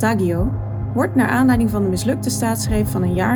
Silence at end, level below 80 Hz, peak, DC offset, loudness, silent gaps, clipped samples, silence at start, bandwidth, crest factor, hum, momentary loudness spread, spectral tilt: 0 s; -32 dBFS; -4 dBFS; under 0.1%; -19 LUFS; none; under 0.1%; 0 s; over 20 kHz; 14 dB; none; 6 LU; -6 dB/octave